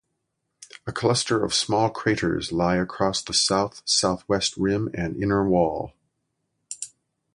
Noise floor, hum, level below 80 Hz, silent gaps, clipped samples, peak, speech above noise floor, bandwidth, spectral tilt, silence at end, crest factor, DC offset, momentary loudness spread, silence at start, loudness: -78 dBFS; none; -50 dBFS; none; under 0.1%; -6 dBFS; 54 dB; 11.5 kHz; -4 dB/octave; 0.45 s; 18 dB; under 0.1%; 14 LU; 0.6 s; -23 LUFS